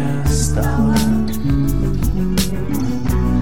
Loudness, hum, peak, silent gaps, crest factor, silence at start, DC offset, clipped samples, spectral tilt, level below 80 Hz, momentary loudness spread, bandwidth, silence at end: -18 LUFS; none; -4 dBFS; none; 12 dB; 0 s; 7%; under 0.1%; -6 dB/octave; -22 dBFS; 4 LU; 17.5 kHz; 0 s